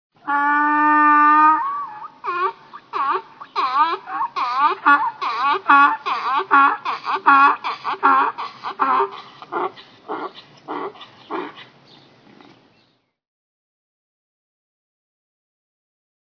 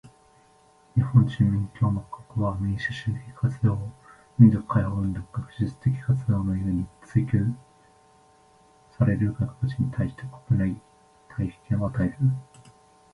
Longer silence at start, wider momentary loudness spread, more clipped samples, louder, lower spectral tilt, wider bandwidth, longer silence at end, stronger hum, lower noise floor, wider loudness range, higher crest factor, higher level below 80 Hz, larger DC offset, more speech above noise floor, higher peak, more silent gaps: first, 0.25 s vs 0.05 s; first, 17 LU vs 12 LU; neither; first, -17 LUFS vs -26 LUFS; second, -4 dB/octave vs -9 dB/octave; second, 5.4 kHz vs 10.5 kHz; first, 4.7 s vs 0.7 s; neither; first, -63 dBFS vs -58 dBFS; first, 18 LU vs 4 LU; about the same, 20 dB vs 22 dB; second, -82 dBFS vs -46 dBFS; neither; first, 48 dB vs 34 dB; first, 0 dBFS vs -4 dBFS; neither